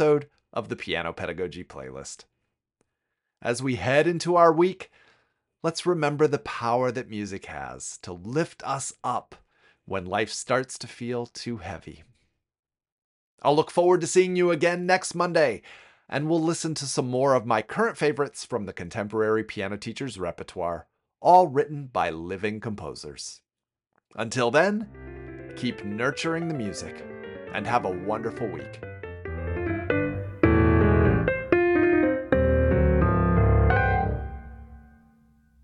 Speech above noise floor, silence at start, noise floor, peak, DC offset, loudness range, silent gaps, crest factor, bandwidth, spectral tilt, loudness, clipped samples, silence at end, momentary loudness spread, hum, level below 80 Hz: 60 dB; 0 s; -86 dBFS; -4 dBFS; under 0.1%; 9 LU; 12.59-12.63 s, 12.92-13.38 s; 20 dB; 11.5 kHz; -6 dB/octave; -25 LUFS; under 0.1%; 0.8 s; 17 LU; none; -38 dBFS